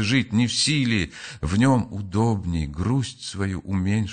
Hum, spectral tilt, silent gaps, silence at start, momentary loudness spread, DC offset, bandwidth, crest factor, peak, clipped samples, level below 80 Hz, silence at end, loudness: none; -5 dB/octave; none; 0 s; 9 LU; under 0.1%; 9.4 kHz; 16 dB; -6 dBFS; under 0.1%; -40 dBFS; 0 s; -23 LUFS